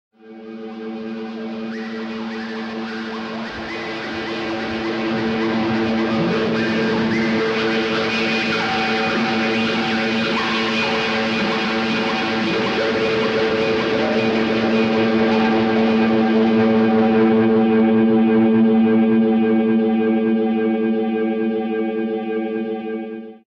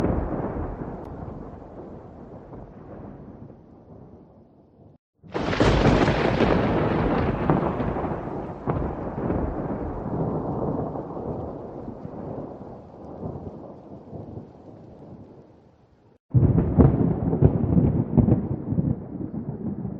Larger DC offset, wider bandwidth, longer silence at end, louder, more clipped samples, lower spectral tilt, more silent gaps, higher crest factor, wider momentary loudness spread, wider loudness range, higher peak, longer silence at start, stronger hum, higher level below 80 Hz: neither; second, 7.4 kHz vs 8.2 kHz; first, 0.2 s vs 0 s; first, -19 LUFS vs -24 LUFS; neither; second, -6 dB/octave vs -8.5 dB/octave; second, none vs 4.99-5.13 s, 16.20-16.29 s; second, 12 dB vs 24 dB; second, 12 LU vs 22 LU; second, 10 LU vs 19 LU; second, -6 dBFS vs -2 dBFS; first, 0.25 s vs 0 s; neither; second, -54 dBFS vs -38 dBFS